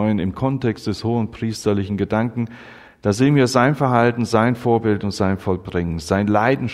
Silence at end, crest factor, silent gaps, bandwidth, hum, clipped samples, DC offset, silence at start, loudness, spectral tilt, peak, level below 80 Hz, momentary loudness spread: 0 s; 18 dB; none; 14 kHz; none; under 0.1%; under 0.1%; 0 s; -19 LUFS; -6.5 dB/octave; 0 dBFS; -46 dBFS; 8 LU